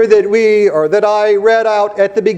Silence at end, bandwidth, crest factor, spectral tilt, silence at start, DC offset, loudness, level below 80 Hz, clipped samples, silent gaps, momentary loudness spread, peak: 0 s; 8.6 kHz; 10 dB; -5 dB/octave; 0 s; under 0.1%; -11 LUFS; -56 dBFS; under 0.1%; none; 4 LU; 0 dBFS